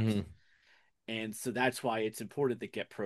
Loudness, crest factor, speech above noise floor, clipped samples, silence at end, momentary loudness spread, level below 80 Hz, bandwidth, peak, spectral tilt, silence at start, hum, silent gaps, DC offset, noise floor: -35 LUFS; 20 dB; 34 dB; under 0.1%; 0 s; 9 LU; -66 dBFS; 12.5 kHz; -16 dBFS; -5 dB/octave; 0 s; none; none; under 0.1%; -69 dBFS